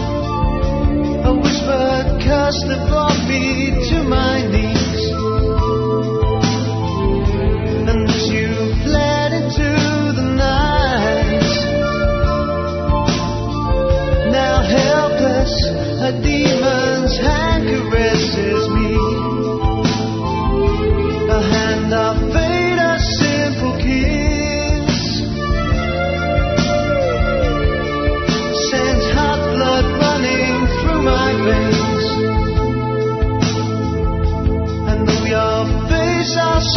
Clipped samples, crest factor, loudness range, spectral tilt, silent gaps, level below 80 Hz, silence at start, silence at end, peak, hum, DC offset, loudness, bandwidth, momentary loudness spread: under 0.1%; 16 dB; 2 LU; -5.5 dB/octave; none; -22 dBFS; 0 s; 0 s; 0 dBFS; none; under 0.1%; -16 LUFS; 6.4 kHz; 4 LU